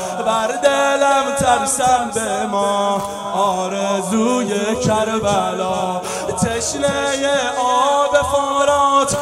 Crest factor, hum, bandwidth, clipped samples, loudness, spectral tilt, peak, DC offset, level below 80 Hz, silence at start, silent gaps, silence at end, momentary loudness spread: 16 dB; none; 15.5 kHz; under 0.1%; -17 LUFS; -3.5 dB/octave; 0 dBFS; under 0.1%; -46 dBFS; 0 s; none; 0 s; 5 LU